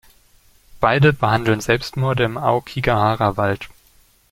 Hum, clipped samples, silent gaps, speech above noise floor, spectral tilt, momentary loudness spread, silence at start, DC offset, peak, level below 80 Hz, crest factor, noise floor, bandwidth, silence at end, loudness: none; under 0.1%; none; 37 dB; -6.5 dB/octave; 7 LU; 0.75 s; under 0.1%; -2 dBFS; -44 dBFS; 18 dB; -54 dBFS; 16 kHz; 0.6 s; -18 LUFS